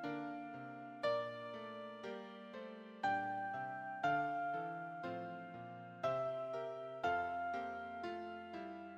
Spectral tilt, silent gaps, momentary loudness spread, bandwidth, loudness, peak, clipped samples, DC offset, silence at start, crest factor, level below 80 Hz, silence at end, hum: -6 dB/octave; none; 12 LU; 8.4 kHz; -43 LUFS; -26 dBFS; under 0.1%; under 0.1%; 0 s; 18 dB; -80 dBFS; 0 s; none